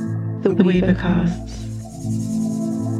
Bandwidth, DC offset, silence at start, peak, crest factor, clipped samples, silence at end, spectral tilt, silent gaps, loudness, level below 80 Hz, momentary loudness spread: 12 kHz; under 0.1%; 0 s; -2 dBFS; 18 dB; under 0.1%; 0 s; -7.5 dB/octave; none; -20 LUFS; -36 dBFS; 14 LU